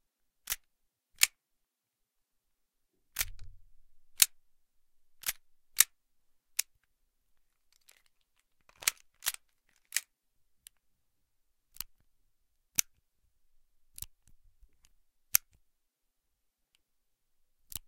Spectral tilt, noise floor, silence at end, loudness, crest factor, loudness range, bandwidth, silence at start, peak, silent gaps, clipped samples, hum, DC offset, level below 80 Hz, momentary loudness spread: 3 dB/octave; -85 dBFS; 0.1 s; -32 LUFS; 38 dB; 9 LU; 16.5 kHz; 0.5 s; -2 dBFS; none; under 0.1%; none; under 0.1%; -62 dBFS; 19 LU